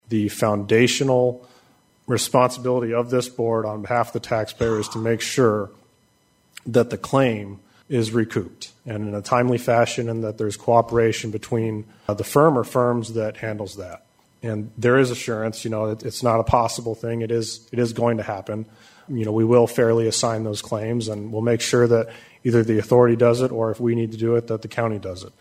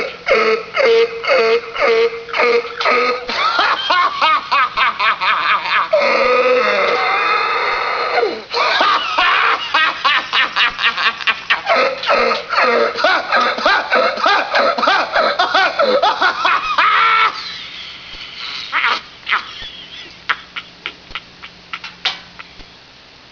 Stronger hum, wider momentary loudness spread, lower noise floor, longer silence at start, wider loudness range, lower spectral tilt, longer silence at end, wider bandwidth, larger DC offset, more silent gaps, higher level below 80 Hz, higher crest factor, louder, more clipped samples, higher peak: neither; about the same, 12 LU vs 14 LU; first, -61 dBFS vs -42 dBFS; about the same, 0.1 s vs 0 s; second, 4 LU vs 8 LU; first, -5.5 dB/octave vs -2 dB/octave; second, 0.1 s vs 0.65 s; first, 16 kHz vs 5.4 kHz; neither; neither; about the same, -52 dBFS vs -52 dBFS; about the same, 20 dB vs 16 dB; second, -21 LUFS vs -14 LUFS; neither; about the same, -2 dBFS vs 0 dBFS